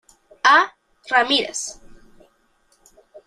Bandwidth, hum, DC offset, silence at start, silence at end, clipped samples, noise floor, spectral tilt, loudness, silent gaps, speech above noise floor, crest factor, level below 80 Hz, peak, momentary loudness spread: 14 kHz; none; under 0.1%; 0.45 s; 0.1 s; under 0.1%; -62 dBFS; 0 dB/octave; -18 LUFS; none; 44 dB; 20 dB; -58 dBFS; -2 dBFS; 13 LU